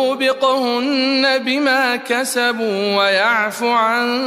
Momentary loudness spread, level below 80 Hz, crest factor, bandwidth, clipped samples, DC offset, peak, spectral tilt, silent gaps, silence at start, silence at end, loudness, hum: 3 LU; -68 dBFS; 14 dB; 15 kHz; under 0.1%; under 0.1%; -2 dBFS; -2.5 dB/octave; none; 0 s; 0 s; -16 LUFS; none